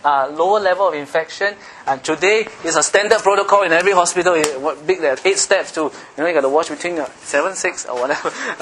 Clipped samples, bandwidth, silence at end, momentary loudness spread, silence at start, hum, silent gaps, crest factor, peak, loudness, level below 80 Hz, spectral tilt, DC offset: under 0.1%; 12 kHz; 0 s; 9 LU; 0.05 s; none; none; 18 dB; 0 dBFS; -17 LUFS; -60 dBFS; -2 dB/octave; under 0.1%